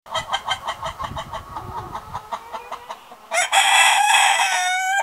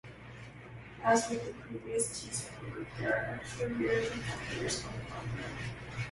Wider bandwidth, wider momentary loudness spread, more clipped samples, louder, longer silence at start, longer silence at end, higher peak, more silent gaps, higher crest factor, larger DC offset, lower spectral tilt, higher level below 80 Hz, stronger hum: first, 16.5 kHz vs 11.5 kHz; about the same, 20 LU vs 19 LU; neither; first, -17 LUFS vs -35 LUFS; about the same, 0.05 s vs 0.05 s; about the same, 0 s vs 0 s; first, -2 dBFS vs -14 dBFS; neither; about the same, 18 dB vs 22 dB; neither; second, 0.5 dB/octave vs -4 dB/octave; first, -48 dBFS vs -56 dBFS; neither